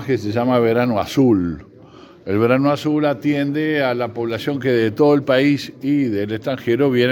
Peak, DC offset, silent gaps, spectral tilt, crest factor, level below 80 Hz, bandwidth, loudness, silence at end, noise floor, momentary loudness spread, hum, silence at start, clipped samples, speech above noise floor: -2 dBFS; under 0.1%; none; -7 dB/octave; 16 dB; -56 dBFS; 17.5 kHz; -18 LUFS; 0 s; -43 dBFS; 7 LU; none; 0 s; under 0.1%; 26 dB